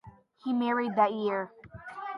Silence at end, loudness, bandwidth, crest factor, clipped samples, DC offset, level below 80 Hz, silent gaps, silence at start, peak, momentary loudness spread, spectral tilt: 0 s; -29 LUFS; 5.8 kHz; 20 dB; under 0.1%; under 0.1%; -66 dBFS; none; 0.05 s; -12 dBFS; 17 LU; -7.5 dB/octave